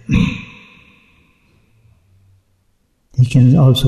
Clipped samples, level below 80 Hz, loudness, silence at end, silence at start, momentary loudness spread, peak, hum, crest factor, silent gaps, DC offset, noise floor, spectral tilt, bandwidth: under 0.1%; -36 dBFS; -13 LUFS; 0 s; 0.1 s; 19 LU; -2 dBFS; none; 14 dB; none; under 0.1%; -61 dBFS; -7.5 dB/octave; 13.5 kHz